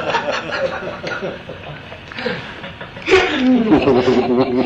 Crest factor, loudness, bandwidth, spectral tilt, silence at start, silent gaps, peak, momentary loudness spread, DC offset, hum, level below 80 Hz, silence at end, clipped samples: 18 dB; -17 LUFS; 8.2 kHz; -5.5 dB/octave; 0 s; none; 0 dBFS; 18 LU; under 0.1%; none; -44 dBFS; 0 s; under 0.1%